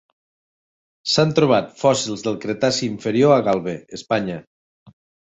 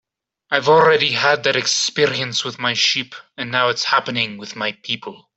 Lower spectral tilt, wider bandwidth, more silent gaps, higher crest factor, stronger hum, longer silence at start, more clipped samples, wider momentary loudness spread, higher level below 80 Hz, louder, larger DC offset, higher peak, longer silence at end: first, -5 dB/octave vs -2.5 dB/octave; about the same, 8.4 kHz vs 8.2 kHz; first, 4.47-4.86 s vs none; about the same, 20 dB vs 18 dB; neither; first, 1.05 s vs 0.5 s; neither; about the same, 14 LU vs 12 LU; first, -58 dBFS vs -64 dBFS; about the same, -19 LUFS vs -17 LUFS; neither; about the same, -2 dBFS vs -2 dBFS; first, 0.35 s vs 0.2 s